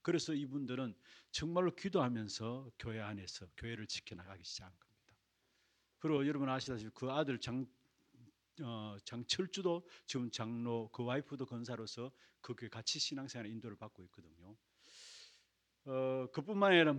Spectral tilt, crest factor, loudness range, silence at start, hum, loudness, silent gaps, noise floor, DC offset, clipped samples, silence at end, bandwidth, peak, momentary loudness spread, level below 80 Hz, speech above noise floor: -4.5 dB/octave; 26 dB; 6 LU; 0.05 s; none; -40 LUFS; none; -79 dBFS; under 0.1%; under 0.1%; 0 s; 10.5 kHz; -16 dBFS; 14 LU; -72 dBFS; 39 dB